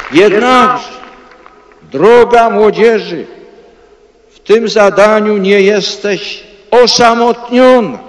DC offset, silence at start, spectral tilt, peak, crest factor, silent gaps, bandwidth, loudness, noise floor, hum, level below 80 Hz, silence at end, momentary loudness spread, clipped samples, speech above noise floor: under 0.1%; 0 s; -4 dB/octave; 0 dBFS; 10 dB; none; 11 kHz; -8 LUFS; -44 dBFS; none; -46 dBFS; 0 s; 13 LU; 4%; 36 dB